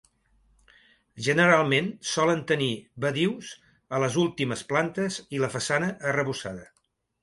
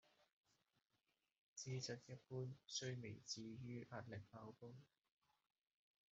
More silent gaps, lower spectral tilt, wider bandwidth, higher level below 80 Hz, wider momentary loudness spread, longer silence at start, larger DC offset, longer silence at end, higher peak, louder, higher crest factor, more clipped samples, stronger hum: second, none vs 0.33-0.44 s, 1.39-1.56 s; about the same, -4.5 dB/octave vs -5 dB/octave; first, 11.5 kHz vs 8 kHz; first, -64 dBFS vs -86 dBFS; about the same, 11 LU vs 12 LU; first, 1.15 s vs 0.2 s; neither; second, 0.6 s vs 1.25 s; first, -6 dBFS vs -36 dBFS; first, -26 LUFS vs -53 LUFS; about the same, 22 dB vs 20 dB; neither; neither